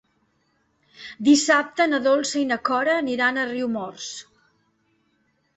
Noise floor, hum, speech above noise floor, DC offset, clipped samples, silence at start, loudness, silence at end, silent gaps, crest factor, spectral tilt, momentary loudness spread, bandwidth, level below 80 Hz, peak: -68 dBFS; none; 46 dB; under 0.1%; under 0.1%; 1 s; -21 LUFS; 1.35 s; none; 20 dB; -2.5 dB/octave; 16 LU; 8.2 kHz; -66 dBFS; -4 dBFS